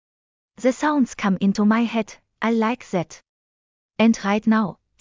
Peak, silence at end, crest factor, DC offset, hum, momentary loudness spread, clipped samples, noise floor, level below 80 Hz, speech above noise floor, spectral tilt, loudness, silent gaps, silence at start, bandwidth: -6 dBFS; 0.25 s; 16 dB; under 0.1%; none; 9 LU; under 0.1%; under -90 dBFS; -60 dBFS; over 70 dB; -6 dB/octave; -21 LUFS; 3.29-3.89 s; 0.6 s; 7.6 kHz